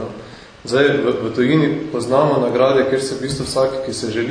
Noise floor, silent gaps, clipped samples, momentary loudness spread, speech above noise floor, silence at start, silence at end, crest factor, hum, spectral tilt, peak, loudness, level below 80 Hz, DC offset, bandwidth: -37 dBFS; none; under 0.1%; 8 LU; 20 dB; 0 s; 0 s; 16 dB; none; -5.5 dB/octave; 0 dBFS; -17 LUFS; -48 dBFS; under 0.1%; 11 kHz